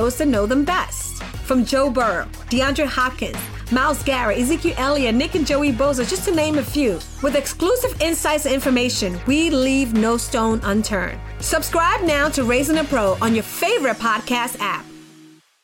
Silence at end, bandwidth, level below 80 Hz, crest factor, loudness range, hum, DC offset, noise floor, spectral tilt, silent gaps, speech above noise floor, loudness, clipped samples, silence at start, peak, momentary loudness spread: 0.4 s; 17 kHz; -34 dBFS; 12 dB; 1 LU; none; under 0.1%; -48 dBFS; -4 dB/octave; none; 29 dB; -19 LUFS; under 0.1%; 0 s; -8 dBFS; 6 LU